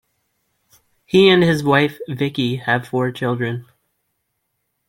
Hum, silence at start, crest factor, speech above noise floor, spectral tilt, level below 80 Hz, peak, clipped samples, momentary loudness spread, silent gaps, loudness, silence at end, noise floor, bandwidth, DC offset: none; 1.15 s; 18 dB; 56 dB; -6.5 dB/octave; -58 dBFS; -2 dBFS; under 0.1%; 11 LU; none; -17 LUFS; 1.25 s; -73 dBFS; 16.5 kHz; under 0.1%